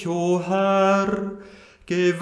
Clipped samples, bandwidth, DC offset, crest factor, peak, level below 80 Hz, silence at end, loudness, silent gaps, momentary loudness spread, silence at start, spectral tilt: under 0.1%; 10 kHz; under 0.1%; 14 dB; -8 dBFS; -58 dBFS; 0 s; -21 LUFS; none; 12 LU; 0 s; -6 dB/octave